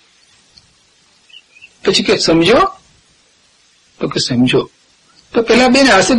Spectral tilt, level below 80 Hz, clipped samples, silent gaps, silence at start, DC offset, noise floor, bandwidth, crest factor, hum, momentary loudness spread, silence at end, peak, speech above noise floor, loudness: -4 dB/octave; -44 dBFS; under 0.1%; none; 1.85 s; under 0.1%; -52 dBFS; 11.5 kHz; 14 dB; none; 11 LU; 0 s; 0 dBFS; 42 dB; -12 LUFS